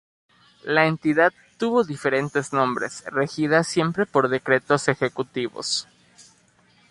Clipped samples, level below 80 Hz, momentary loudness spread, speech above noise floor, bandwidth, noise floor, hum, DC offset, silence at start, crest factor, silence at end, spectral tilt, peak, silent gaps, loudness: under 0.1%; -64 dBFS; 8 LU; 37 dB; 11.5 kHz; -59 dBFS; none; under 0.1%; 0.65 s; 20 dB; 0.7 s; -4.5 dB/octave; -4 dBFS; none; -22 LUFS